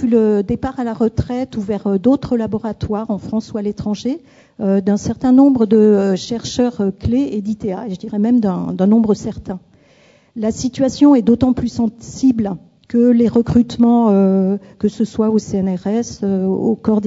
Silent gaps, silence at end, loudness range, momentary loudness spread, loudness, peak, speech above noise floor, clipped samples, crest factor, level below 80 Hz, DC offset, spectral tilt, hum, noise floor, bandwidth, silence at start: none; 0 s; 4 LU; 11 LU; -16 LUFS; 0 dBFS; 35 dB; under 0.1%; 14 dB; -42 dBFS; under 0.1%; -7.5 dB/octave; none; -50 dBFS; 7.8 kHz; 0 s